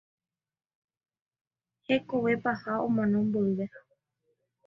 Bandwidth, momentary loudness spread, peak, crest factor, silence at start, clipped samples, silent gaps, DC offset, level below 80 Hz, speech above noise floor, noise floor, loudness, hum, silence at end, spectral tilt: 6 kHz; 4 LU; -14 dBFS; 18 dB; 1.9 s; under 0.1%; none; under 0.1%; -70 dBFS; 50 dB; -78 dBFS; -29 LUFS; none; 0.9 s; -8.5 dB/octave